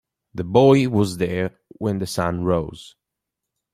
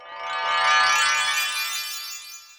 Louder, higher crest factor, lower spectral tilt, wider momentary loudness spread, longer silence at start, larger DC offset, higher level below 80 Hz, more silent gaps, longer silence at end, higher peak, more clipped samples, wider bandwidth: about the same, -20 LUFS vs -21 LUFS; about the same, 20 dB vs 18 dB; first, -6.5 dB/octave vs 3 dB/octave; about the same, 16 LU vs 14 LU; first, 0.35 s vs 0 s; neither; first, -50 dBFS vs -68 dBFS; neither; first, 0.85 s vs 0.05 s; first, -2 dBFS vs -6 dBFS; neither; second, 15 kHz vs over 20 kHz